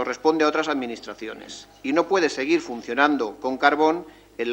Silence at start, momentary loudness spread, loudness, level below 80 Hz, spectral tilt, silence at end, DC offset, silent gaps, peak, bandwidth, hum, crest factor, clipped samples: 0 s; 15 LU; -22 LUFS; -62 dBFS; -4 dB/octave; 0 s; under 0.1%; none; -2 dBFS; 16.5 kHz; none; 20 dB; under 0.1%